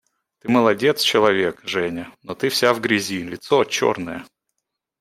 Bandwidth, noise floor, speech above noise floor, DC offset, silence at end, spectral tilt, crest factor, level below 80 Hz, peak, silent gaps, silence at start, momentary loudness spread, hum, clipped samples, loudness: 16 kHz; -80 dBFS; 60 dB; under 0.1%; 0.75 s; -4 dB/octave; 20 dB; -62 dBFS; -2 dBFS; none; 0.45 s; 15 LU; none; under 0.1%; -19 LUFS